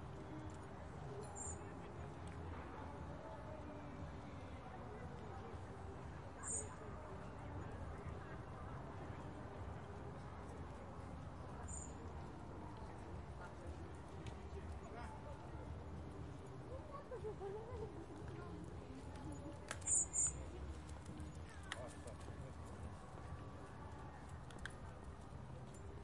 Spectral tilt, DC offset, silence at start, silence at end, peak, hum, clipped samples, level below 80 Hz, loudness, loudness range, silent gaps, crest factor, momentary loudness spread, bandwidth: -4 dB/octave; under 0.1%; 0 s; 0 s; -26 dBFS; none; under 0.1%; -60 dBFS; -49 LUFS; 10 LU; none; 24 dB; 5 LU; 11.5 kHz